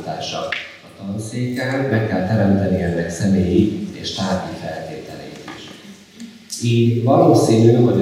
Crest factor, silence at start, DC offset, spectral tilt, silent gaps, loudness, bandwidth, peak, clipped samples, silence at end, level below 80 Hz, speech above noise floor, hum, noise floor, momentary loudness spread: 16 dB; 0 s; under 0.1%; -6.5 dB/octave; none; -18 LUFS; 14.5 kHz; -2 dBFS; under 0.1%; 0 s; -54 dBFS; 23 dB; none; -40 dBFS; 21 LU